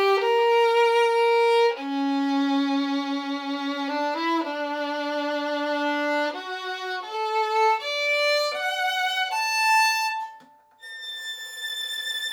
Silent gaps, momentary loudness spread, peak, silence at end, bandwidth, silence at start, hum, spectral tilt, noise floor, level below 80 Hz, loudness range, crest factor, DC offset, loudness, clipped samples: none; 11 LU; -10 dBFS; 0 s; over 20 kHz; 0 s; none; -0.5 dB/octave; -51 dBFS; under -90 dBFS; 5 LU; 14 dB; under 0.1%; -24 LUFS; under 0.1%